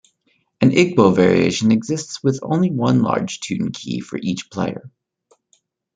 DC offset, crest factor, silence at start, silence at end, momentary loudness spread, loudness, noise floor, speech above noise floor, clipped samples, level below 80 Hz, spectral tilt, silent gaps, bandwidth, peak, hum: under 0.1%; 18 dB; 0.6 s; 1.1 s; 11 LU; -18 LUFS; -65 dBFS; 47 dB; under 0.1%; -58 dBFS; -6 dB/octave; none; 9.4 kHz; -2 dBFS; none